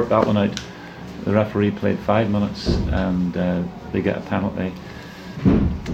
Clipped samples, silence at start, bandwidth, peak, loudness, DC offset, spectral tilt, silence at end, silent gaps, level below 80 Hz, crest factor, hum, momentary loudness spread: under 0.1%; 0 s; 8.4 kHz; -4 dBFS; -21 LUFS; under 0.1%; -7.5 dB/octave; 0 s; none; -34 dBFS; 18 dB; none; 17 LU